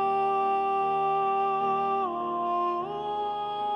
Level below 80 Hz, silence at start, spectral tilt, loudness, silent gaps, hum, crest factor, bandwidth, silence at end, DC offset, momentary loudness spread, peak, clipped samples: -66 dBFS; 0 s; -6.5 dB/octave; -27 LUFS; none; none; 10 dB; 6.2 kHz; 0 s; under 0.1%; 5 LU; -18 dBFS; under 0.1%